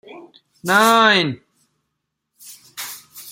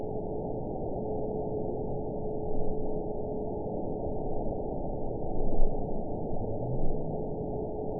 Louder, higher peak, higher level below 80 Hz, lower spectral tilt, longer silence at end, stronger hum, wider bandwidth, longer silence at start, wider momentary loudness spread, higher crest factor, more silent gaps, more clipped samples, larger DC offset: first, -14 LUFS vs -35 LUFS; first, 0 dBFS vs -10 dBFS; second, -68 dBFS vs -34 dBFS; second, -3 dB/octave vs -16 dB/octave; about the same, 0 s vs 0 s; neither; first, 17 kHz vs 1 kHz; about the same, 0.1 s vs 0 s; first, 23 LU vs 2 LU; about the same, 20 dB vs 20 dB; neither; neither; second, under 0.1% vs 0.7%